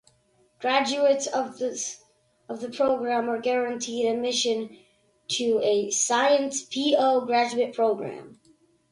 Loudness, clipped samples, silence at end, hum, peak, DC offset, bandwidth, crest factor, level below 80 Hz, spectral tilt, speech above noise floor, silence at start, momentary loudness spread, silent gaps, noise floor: -25 LUFS; under 0.1%; 0.6 s; none; -8 dBFS; under 0.1%; 11.5 kHz; 18 dB; -72 dBFS; -2 dB/octave; 40 dB; 0.6 s; 13 LU; none; -65 dBFS